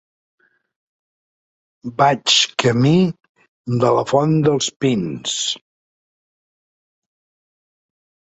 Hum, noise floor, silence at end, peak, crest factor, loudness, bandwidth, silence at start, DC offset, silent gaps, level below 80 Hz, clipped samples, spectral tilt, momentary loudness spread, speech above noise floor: none; under -90 dBFS; 2.8 s; -2 dBFS; 20 dB; -17 LUFS; 8.2 kHz; 1.85 s; under 0.1%; 3.29-3.35 s, 3.48-3.64 s, 4.76-4.80 s; -58 dBFS; under 0.1%; -4.5 dB/octave; 11 LU; over 73 dB